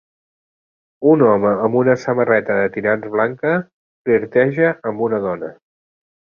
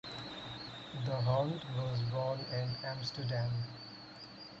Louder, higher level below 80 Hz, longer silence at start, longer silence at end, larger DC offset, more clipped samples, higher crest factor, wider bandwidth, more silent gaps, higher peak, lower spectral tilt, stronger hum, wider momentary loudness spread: first, -17 LUFS vs -38 LUFS; first, -58 dBFS vs -64 dBFS; first, 1 s vs 0.05 s; first, 0.75 s vs 0 s; neither; neither; about the same, 16 dB vs 16 dB; second, 7 kHz vs 7.8 kHz; first, 3.73-4.05 s vs none; first, -2 dBFS vs -22 dBFS; first, -8.5 dB/octave vs -6.5 dB/octave; neither; second, 8 LU vs 15 LU